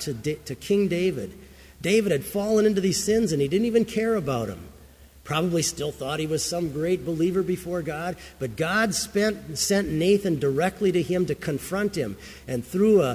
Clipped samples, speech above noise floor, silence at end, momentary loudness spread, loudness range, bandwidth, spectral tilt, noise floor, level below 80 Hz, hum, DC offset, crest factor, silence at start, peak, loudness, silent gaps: under 0.1%; 25 dB; 0 s; 10 LU; 3 LU; 16 kHz; -5 dB/octave; -50 dBFS; -50 dBFS; none; under 0.1%; 16 dB; 0 s; -8 dBFS; -25 LUFS; none